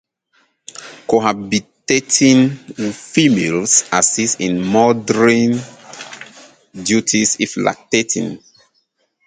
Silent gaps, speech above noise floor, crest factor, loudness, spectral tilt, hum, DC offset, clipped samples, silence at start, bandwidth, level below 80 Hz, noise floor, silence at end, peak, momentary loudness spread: none; 49 dB; 16 dB; -15 LUFS; -3.5 dB/octave; none; under 0.1%; under 0.1%; 0.8 s; 9.6 kHz; -56 dBFS; -64 dBFS; 0.9 s; 0 dBFS; 20 LU